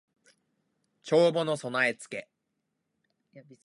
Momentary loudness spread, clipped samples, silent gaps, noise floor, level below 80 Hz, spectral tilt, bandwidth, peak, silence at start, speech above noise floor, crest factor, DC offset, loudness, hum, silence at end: 17 LU; under 0.1%; none; -81 dBFS; -82 dBFS; -5 dB/octave; 11.5 kHz; -10 dBFS; 1.05 s; 53 dB; 22 dB; under 0.1%; -27 LUFS; none; 0.25 s